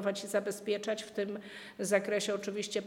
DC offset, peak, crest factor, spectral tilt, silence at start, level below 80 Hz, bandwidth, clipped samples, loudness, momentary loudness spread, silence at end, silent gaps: under 0.1%; -16 dBFS; 20 dB; -3.5 dB/octave; 0 s; -80 dBFS; 17 kHz; under 0.1%; -34 LUFS; 9 LU; 0 s; none